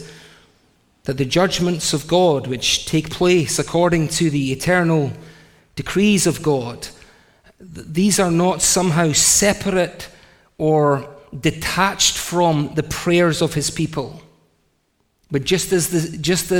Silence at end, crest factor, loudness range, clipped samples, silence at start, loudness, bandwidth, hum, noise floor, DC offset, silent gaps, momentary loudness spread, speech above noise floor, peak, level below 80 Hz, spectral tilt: 0 s; 18 dB; 4 LU; under 0.1%; 0 s; -18 LUFS; 17.5 kHz; none; -65 dBFS; under 0.1%; none; 12 LU; 47 dB; -2 dBFS; -44 dBFS; -4 dB/octave